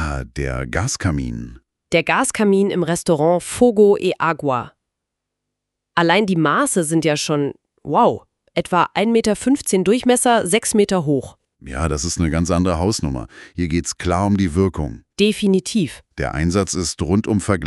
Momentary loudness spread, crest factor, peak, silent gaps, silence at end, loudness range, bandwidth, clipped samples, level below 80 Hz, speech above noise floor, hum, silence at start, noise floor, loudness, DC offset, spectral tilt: 10 LU; 18 dB; 0 dBFS; none; 0 s; 3 LU; 12 kHz; under 0.1%; -36 dBFS; 62 dB; none; 0 s; -80 dBFS; -18 LUFS; under 0.1%; -5 dB/octave